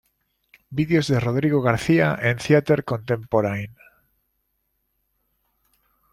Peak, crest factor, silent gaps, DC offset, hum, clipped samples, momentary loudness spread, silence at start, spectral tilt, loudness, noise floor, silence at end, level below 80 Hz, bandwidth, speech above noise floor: -2 dBFS; 20 dB; none; under 0.1%; none; under 0.1%; 8 LU; 0.7 s; -7 dB/octave; -21 LUFS; -73 dBFS; 2.45 s; -54 dBFS; 13.5 kHz; 53 dB